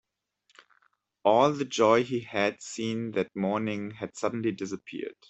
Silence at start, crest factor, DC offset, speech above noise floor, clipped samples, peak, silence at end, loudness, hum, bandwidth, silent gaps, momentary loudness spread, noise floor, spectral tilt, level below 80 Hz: 1.25 s; 20 dB; under 0.1%; 44 dB; under 0.1%; -8 dBFS; 0.2 s; -28 LUFS; none; 8.4 kHz; none; 13 LU; -72 dBFS; -5 dB/octave; -72 dBFS